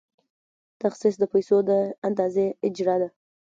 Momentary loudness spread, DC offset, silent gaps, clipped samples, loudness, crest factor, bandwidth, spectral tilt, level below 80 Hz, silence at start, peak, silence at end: 7 LU; under 0.1%; 1.98-2.02 s; under 0.1%; -24 LUFS; 16 dB; 7.6 kHz; -7 dB/octave; -72 dBFS; 0.85 s; -10 dBFS; 0.35 s